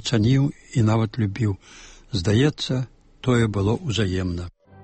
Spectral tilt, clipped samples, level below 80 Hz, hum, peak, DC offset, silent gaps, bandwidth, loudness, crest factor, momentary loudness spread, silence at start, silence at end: -6.5 dB/octave; under 0.1%; -44 dBFS; none; -8 dBFS; under 0.1%; none; 8.8 kHz; -23 LUFS; 14 dB; 10 LU; 0 s; 0.35 s